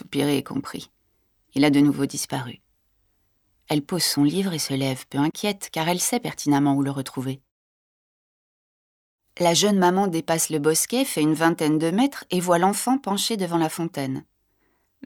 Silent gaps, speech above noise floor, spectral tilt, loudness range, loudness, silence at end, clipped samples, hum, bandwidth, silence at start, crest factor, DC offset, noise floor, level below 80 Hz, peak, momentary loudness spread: 7.51-9.18 s; 46 dB; -4.5 dB/octave; 5 LU; -23 LUFS; 0.85 s; under 0.1%; none; 19 kHz; 0 s; 18 dB; under 0.1%; -68 dBFS; -66 dBFS; -4 dBFS; 11 LU